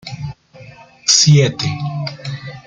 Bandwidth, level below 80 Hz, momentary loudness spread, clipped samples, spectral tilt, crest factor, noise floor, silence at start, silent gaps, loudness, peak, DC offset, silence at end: 9.2 kHz; -50 dBFS; 20 LU; under 0.1%; -3.5 dB/octave; 18 dB; -40 dBFS; 0.05 s; none; -14 LUFS; 0 dBFS; under 0.1%; 0.05 s